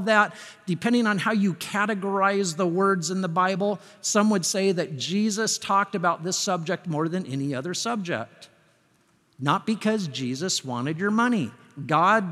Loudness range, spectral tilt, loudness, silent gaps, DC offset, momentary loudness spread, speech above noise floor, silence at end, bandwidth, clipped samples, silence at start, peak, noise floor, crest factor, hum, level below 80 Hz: 5 LU; -4 dB/octave; -25 LUFS; none; under 0.1%; 7 LU; 39 dB; 0 s; 14 kHz; under 0.1%; 0 s; -6 dBFS; -64 dBFS; 20 dB; none; -78 dBFS